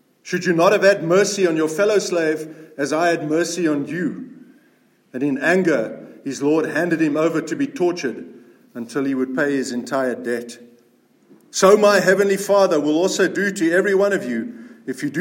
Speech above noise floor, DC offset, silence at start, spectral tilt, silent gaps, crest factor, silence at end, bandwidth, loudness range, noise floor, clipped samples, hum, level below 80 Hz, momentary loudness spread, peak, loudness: 39 dB; under 0.1%; 0.25 s; -4.5 dB/octave; none; 18 dB; 0 s; 16.5 kHz; 6 LU; -57 dBFS; under 0.1%; none; -72 dBFS; 14 LU; -2 dBFS; -19 LUFS